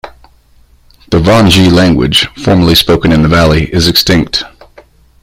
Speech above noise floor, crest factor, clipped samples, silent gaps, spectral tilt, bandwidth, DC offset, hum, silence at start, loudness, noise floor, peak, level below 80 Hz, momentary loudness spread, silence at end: 37 dB; 10 dB; 0.2%; none; -5 dB/octave; 16.5 kHz; under 0.1%; none; 0.05 s; -8 LUFS; -44 dBFS; 0 dBFS; -26 dBFS; 7 LU; 0.75 s